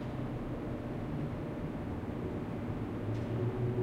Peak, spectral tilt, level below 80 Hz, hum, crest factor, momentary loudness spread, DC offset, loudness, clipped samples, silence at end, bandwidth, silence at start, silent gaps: -22 dBFS; -9 dB/octave; -50 dBFS; none; 14 dB; 4 LU; under 0.1%; -38 LUFS; under 0.1%; 0 s; 10 kHz; 0 s; none